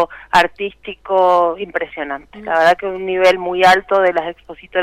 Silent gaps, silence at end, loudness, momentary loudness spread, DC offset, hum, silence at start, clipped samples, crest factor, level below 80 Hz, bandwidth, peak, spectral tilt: none; 0 s; -15 LUFS; 14 LU; under 0.1%; none; 0 s; under 0.1%; 12 dB; -50 dBFS; 16 kHz; -4 dBFS; -4 dB/octave